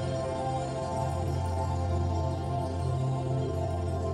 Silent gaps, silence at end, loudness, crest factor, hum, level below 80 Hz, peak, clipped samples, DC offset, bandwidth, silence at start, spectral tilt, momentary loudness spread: none; 0 s; -31 LUFS; 12 dB; none; -42 dBFS; -18 dBFS; under 0.1%; under 0.1%; 11 kHz; 0 s; -7.5 dB/octave; 2 LU